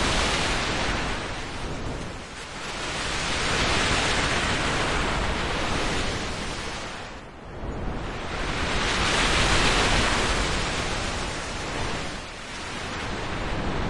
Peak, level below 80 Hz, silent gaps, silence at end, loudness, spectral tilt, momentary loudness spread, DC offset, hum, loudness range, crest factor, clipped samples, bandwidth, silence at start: -8 dBFS; -34 dBFS; none; 0 s; -26 LUFS; -3 dB/octave; 13 LU; under 0.1%; none; 6 LU; 18 dB; under 0.1%; 11.5 kHz; 0 s